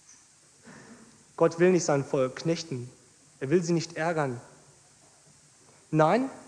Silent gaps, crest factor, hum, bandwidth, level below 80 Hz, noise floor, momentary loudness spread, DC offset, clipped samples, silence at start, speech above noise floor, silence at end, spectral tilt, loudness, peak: none; 20 dB; none; 10.5 kHz; -70 dBFS; -58 dBFS; 17 LU; under 0.1%; under 0.1%; 0.65 s; 32 dB; 0.1 s; -6 dB/octave; -27 LUFS; -8 dBFS